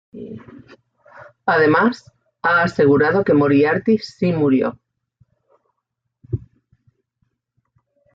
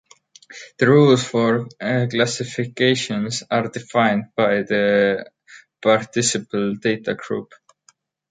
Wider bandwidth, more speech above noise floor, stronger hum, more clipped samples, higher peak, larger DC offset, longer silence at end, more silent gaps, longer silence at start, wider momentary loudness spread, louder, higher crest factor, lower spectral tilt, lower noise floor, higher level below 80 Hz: second, 7.6 kHz vs 9.6 kHz; first, 61 dB vs 40 dB; neither; neither; about the same, -4 dBFS vs -2 dBFS; neither; first, 1.75 s vs 0.85 s; neither; second, 0.15 s vs 0.5 s; first, 20 LU vs 10 LU; about the same, -17 LUFS vs -19 LUFS; about the same, 16 dB vs 18 dB; first, -8 dB/octave vs -4.5 dB/octave; first, -77 dBFS vs -59 dBFS; first, -56 dBFS vs -62 dBFS